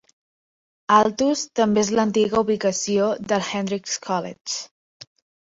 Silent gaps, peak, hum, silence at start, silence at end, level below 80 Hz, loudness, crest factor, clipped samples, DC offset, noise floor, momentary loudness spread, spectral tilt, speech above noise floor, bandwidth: 4.41-4.45 s; -4 dBFS; none; 0.9 s; 0.85 s; -60 dBFS; -21 LUFS; 20 dB; under 0.1%; under 0.1%; under -90 dBFS; 11 LU; -4 dB/octave; over 69 dB; 8 kHz